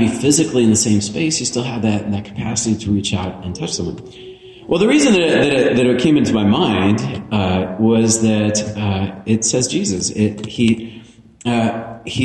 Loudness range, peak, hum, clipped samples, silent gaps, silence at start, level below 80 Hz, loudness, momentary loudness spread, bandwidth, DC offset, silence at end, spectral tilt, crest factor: 5 LU; -2 dBFS; none; under 0.1%; none; 0 s; -46 dBFS; -16 LUFS; 11 LU; 11.5 kHz; under 0.1%; 0 s; -4.5 dB/octave; 14 dB